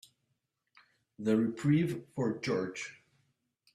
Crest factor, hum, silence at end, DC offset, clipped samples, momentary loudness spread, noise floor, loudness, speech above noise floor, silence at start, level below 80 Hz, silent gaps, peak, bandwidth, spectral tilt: 18 dB; none; 0.8 s; under 0.1%; under 0.1%; 11 LU; -82 dBFS; -32 LUFS; 51 dB; 1.2 s; -72 dBFS; none; -16 dBFS; 13.5 kHz; -7 dB/octave